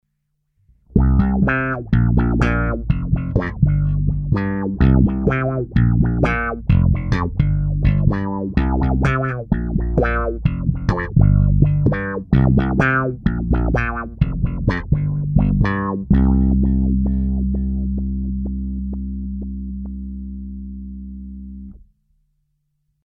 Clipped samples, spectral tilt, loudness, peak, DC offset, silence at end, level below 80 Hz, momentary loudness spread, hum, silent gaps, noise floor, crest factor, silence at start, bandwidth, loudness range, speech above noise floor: under 0.1%; -9.5 dB/octave; -19 LUFS; 0 dBFS; under 0.1%; 1.3 s; -24 dBFS; 13 LU; none; none; -71 dBFS; 18 dB; 0.95 s; 6.2 kHz; 10 LU; 54 dB